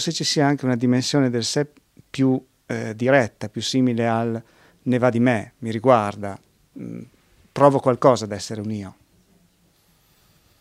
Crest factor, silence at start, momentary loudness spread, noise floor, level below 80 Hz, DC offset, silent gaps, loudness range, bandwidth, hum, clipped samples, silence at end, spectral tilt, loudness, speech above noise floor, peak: 22 dB; 0 s; 17 LU; -60 dBFS; -64 dBFS; under 0.1%; none; 2 LU; 13.5 kHz; none; under 0.1%; 1.7 s; -5.5 dB/octave; -21 LUFS; 40 dB; 0 dBFS